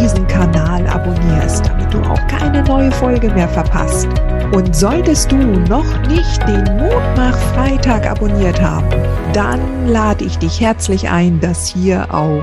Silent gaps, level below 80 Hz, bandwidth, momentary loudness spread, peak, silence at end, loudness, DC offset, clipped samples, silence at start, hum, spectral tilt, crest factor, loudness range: none; -16 dBFS; 12.5 kHz; 3 LU; 0 dBFS; 0 s; -14 LUFS; under 0.1%; under 0.1%; 0 s; none; -6 dB/octave; 12 dB; 1 LU